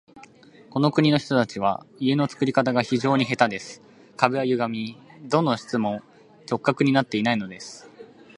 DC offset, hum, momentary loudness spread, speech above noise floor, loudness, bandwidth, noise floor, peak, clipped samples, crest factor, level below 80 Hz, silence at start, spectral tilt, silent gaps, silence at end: under 0.1%; none; 14 LU; 27 dB; -23 LUFS; 11 kHz; -50 dBFS; 0 dBFS; under 0.1%; 24 dB; -66 dBFS; 0.15 s; -6 dB/octave; none; 0.35 s